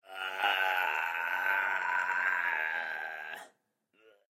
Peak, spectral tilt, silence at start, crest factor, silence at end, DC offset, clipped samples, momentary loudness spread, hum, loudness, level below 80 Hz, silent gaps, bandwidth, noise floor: -14 dBFS; 0 dB/octave; 0.1 s; 20 dB; 0.9 s; under 0.1%; under 0.1%; 10 LU; none; -31 LUFS; under -90 dBFS; none; 16 kHz; -74 dBFS